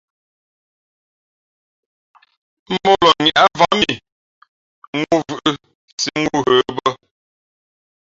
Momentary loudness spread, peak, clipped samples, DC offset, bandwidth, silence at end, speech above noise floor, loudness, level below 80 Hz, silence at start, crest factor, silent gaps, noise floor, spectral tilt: 15 LU; 0 dBFS; under 0.1%; under 0.1%; 7.8 kHz; 1.25 s; over 74 dB; -16 LUFS; -54 dBFS; 2.7 s; 20 dB; 4.12-4.42 s, 4.48-4.93 s, 5.75-5.98 s; under -90 dBFS; -3.5 dB/octave